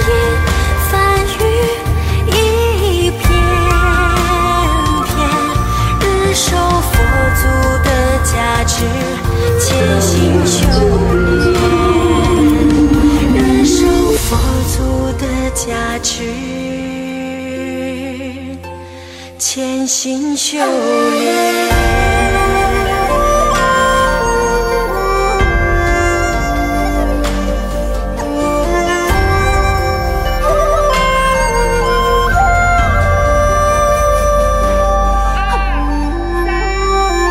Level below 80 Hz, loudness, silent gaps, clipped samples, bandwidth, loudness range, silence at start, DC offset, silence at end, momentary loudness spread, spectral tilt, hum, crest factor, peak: -18 dBFS; -13 LUFS; none; under 0.1%; 16.5 kHz; 6 LU; 0 s; under 0.1%; 0 s; 7 LU; -5 dB/octave; none; 12 dB; 0 dBFS